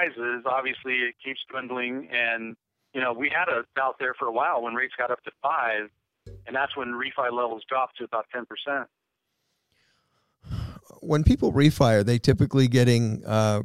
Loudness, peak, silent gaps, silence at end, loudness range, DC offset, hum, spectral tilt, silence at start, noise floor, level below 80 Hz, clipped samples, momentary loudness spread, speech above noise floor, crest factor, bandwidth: -25 LUFS; -6 dBFS; none; 0 s; 9 LU; under 0.1%; none; -6 dB/octave; 0 s; -79 dBFS; -44 dBFS; under 0.1%; 14 LU; 54 dB; 20 dB; 14.5 kHz